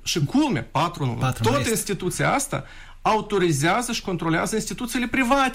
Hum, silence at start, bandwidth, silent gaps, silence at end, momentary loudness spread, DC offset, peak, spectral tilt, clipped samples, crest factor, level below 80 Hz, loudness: none; 0 s; 16 kHz; none; 0 s; 6 LU; under 0.1%; -6 dBFS; -4.5 dB/octave; under 0.1%; 16 dB; -42 dBFS; -23 LUFS